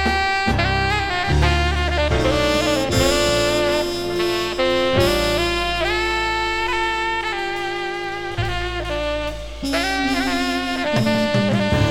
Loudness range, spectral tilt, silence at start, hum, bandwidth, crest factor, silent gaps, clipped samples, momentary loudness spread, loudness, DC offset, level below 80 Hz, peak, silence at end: 5 LU; -4.5 dB/octave; 0 s; none; 18 kHz; 16 dB; none; under 0.1%; 7 LU; -20 LUFS; under 0.1%; -30 dBFS; -4 dBFS; 0 s